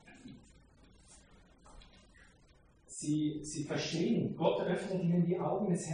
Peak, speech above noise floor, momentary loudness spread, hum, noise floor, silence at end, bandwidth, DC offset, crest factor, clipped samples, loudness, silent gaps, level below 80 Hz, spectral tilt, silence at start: -16 dBFS; 31 dB; 16 LU; none; -64 dBFS; 0 s; 10 kHz; under 0.1%; 20 dB; under 0.1%; -34 LUFS; none; -64 dBFS; -6 dB/octave; 0.05 s